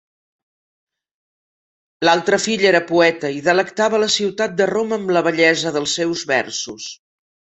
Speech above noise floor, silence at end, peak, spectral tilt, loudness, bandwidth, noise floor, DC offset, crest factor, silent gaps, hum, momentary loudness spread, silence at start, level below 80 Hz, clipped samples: over 73 dB; 0.65 s; -2 dBFS; -3 dB/octave; -17 LUFS; 8.4 kHz; under -90 dBFS; under 0.1%; 18 dB; none; none; 6 LU; 2 s; -62 dBFS; under 0.1%